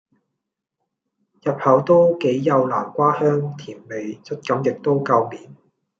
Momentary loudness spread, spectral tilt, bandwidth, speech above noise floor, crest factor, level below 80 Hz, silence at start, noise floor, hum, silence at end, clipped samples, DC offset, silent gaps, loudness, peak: 15 LU; -8 dB/octave; 7.4 kHz; 62 dB; 18 dB; -68 dBFS; 1.45 s; -81 dBFS; none; 0.45 s; under 0.1%; under 0.1%; none; -19 LUFS; -2 dBFS